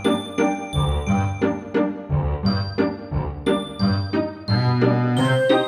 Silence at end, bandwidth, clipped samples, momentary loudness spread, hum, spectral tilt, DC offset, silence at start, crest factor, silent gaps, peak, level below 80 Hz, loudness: 0 s; 10 kHz; under 0.1%; 6 LU; none; -7 dB/octave; under 0.1%; 0 s; 16 dB; none; -6 dBFS; -34 dBFS; -22 LUFS